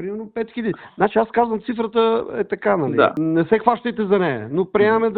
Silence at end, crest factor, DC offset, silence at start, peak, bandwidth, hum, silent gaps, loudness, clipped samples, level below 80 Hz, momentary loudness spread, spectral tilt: 0 s; 20 dB; under 0.1%; 0 s; 0 dBFS; 4.6 kHz; none; none; -20 LUFS; under 0.1%; -56 dBFS; 8 LU; -9.5 dB/octave